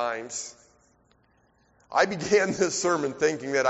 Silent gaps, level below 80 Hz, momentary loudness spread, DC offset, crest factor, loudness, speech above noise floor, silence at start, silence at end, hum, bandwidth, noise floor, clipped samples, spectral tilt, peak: none; -66 dBFS; 12 LU; under 0.1%; 20 dB; -26 LUFS; 39 dB; 0 s; 0 s; none; 8 kHz; -65 dBFS; under 0.1%; -3 dB/octave; -8 dBFS